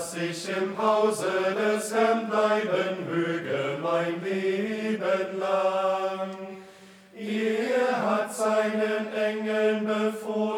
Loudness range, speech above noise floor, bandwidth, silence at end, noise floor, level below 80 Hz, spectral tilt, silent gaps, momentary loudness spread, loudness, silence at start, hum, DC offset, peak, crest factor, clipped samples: 3 LU; 24 dB; 17 kHz; 0 s; -50 dBFS; -80 dBFS; -5 dB/octave; none; 6 LU; -26 LUFS; 0 s; none; under 0.1%; -10 dBFS; 16 dB; under 0.1%